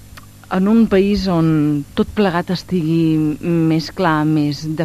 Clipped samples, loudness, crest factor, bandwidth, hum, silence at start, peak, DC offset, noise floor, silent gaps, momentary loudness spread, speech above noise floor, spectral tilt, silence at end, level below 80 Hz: under 0.1%; -16 LUFS; 12 dB; 14 kHz; none; 0.15 s; -4 dBFS; 0.4%; -39 dBFS; none; 6 LU; 24 dB; -7.5 dB/octave; 0 s; -40 dBFS